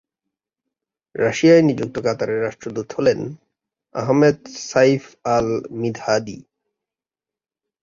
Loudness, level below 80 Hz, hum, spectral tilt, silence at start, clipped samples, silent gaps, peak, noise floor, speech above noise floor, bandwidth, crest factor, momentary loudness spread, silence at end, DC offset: -19 LUFS; -56 dBFS; none; -6 dB/octave; 1.15 s; under 0.1%; none; -2 dBFS; -90 dBFS; 71 dB; 7.6 kHz; 18 dB; 15 LU; 1.4 s; under 0.1%